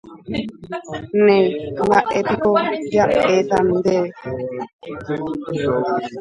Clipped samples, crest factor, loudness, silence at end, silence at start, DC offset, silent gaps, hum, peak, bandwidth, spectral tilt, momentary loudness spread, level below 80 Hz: under 0.1%; 18 dB; -19 LUFS; 0 s; 0.05 s; under 0.1%; 4.73-4.79 s; none; 0 dBFS; 10.5 kHz; -6.5 dB/octave; 14 LU; -50 dBFS